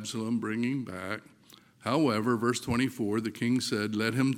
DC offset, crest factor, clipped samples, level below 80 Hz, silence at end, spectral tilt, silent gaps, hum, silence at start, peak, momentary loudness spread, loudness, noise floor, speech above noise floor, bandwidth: under 0.1%; 18 dB; under 0.1%; -62 dBFS; 0 s; -5.5 dB/octave; none; none; 0 s; -12 dBFS; 10 LU; -30 LUFS; -57 dBFS; 28 dB; 16.5 kHz